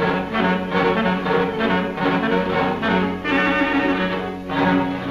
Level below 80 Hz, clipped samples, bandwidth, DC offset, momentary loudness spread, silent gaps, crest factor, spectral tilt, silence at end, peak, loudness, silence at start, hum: -44 dBFS; under 0.1%; 11.5 kHz; under 0.1%; 3 LU; none; 14 dB; -7 dB/octave; 0 s; -6 dBFS; -20 LUFS; 0 s; none